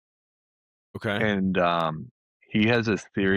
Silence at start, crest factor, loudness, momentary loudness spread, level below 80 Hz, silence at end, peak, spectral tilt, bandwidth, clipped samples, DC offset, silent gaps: 0.95 s; 16 dB; -25 LUFS; 11 LU; -60 dBFS; 0 s; -10 dBFS; -6.5 dB/octave; 11 kHz; under 0.1%; under 0.1%; 2.11-2.40 s